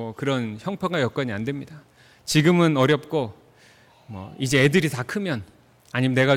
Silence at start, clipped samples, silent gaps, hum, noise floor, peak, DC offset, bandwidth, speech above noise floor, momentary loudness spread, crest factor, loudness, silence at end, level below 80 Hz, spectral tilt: 0 s; under 0.1%; none; none; -54 dBFS; -8 dBFS; under 0.1%; 17 kHz; 32 dB; 16 LU; 16 dB; -23 LUFS; 0 s; -58 dBFS; -5.5 dB/octave